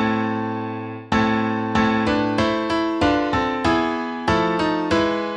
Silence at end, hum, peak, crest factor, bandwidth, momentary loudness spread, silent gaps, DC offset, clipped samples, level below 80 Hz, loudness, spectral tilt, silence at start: 0 s; none; -6 dBFS; 14 dB; 9.8 kHz; 5 LU; none; under 0.1%; under 0.1%; -42 dBFS; -21 LUFS; -6 dB/octave; 0 s